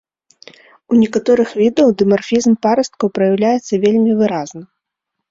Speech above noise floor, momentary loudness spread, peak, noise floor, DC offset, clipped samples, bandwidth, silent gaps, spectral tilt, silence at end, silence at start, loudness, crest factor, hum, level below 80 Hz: 65 dB; 4 LU; -2 dBFS; -78 dBFS; under 0.1%; under 0.1%; 7.8 kHz; none; -6 dB/octave; 0.65 s; 0.9 s; -14 LUFS; 14 dB; none; -56 dBFS